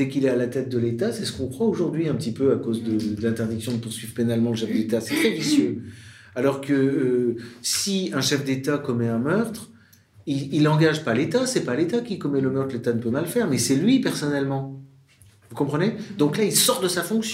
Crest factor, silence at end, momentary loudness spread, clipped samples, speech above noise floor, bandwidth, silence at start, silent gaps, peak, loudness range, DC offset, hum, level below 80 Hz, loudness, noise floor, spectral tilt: 18 dB; 0 s; 9 LU; under 0.1%; 31 dB; 16 kHz; 0 s; none; -6 dBFS; 2 LU; under 0.1%; none; -62 dBFS; -23 LUFS; -54 dBFS; -5 dB/octave